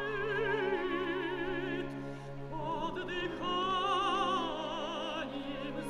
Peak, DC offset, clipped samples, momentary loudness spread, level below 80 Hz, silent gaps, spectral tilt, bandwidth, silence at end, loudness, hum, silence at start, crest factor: -20 dBFS; under 0.1%; under 0.1%; 9 LU; -54 dBFS; none; -5 dB/octave; 12 kHz; 0 s; -35 LUFS; none; 0 s; 14 dB